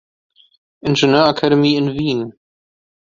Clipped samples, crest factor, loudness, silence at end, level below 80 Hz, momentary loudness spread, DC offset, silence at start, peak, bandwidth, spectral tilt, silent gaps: under 0.1%; 16 dB; -15 LUFS; 0.75 s; -52 dBFS; 11 LU; under 0.1%; 0.85 s; 0 dBFS; 7.6 kHz; -6 dB/octave; none